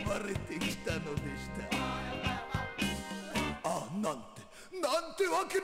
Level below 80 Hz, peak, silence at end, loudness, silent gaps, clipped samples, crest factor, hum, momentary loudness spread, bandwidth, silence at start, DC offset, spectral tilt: -52 dBFS; -20 dBFS; 0 s; -36 LUFS; none; under 0.1%; 16 dB; none; 8 LU; 16 kHz; 0 s; under 0.1%; -4.5 dB/octave